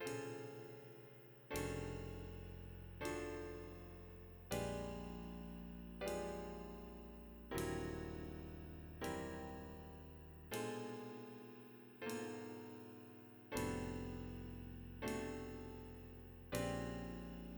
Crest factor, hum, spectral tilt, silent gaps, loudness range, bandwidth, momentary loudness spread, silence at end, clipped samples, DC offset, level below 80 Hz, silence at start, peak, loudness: 22 dB; none; -5.5 dB/octave; none; 2 LU; over 20 kHz; 12 LU; 0 s; under 0.1%; under 0.1%; -60 dBFS; 0 s; -26 dBFS; -49 LUFS